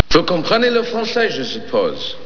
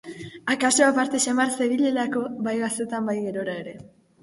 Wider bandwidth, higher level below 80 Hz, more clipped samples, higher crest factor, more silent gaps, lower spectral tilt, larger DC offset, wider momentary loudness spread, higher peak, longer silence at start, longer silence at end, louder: second, 5.4 kHz vs 11.5 kHz; first, -40 dBFS vs -66 dBFS; first, 0.1% vs under 0.1%; about the same, 18 dB vs 18 dB; neither; first, -4.5 dB/octave vs -3 dB/octave; neither; second, 6 LU vs 13 LU; first, 0 dBFS vs -6 dBFS; about the same, 0 s vs 0.05 s; second, 0 s vs 0.35 s; first, -17 LUFS vs -23 LUFS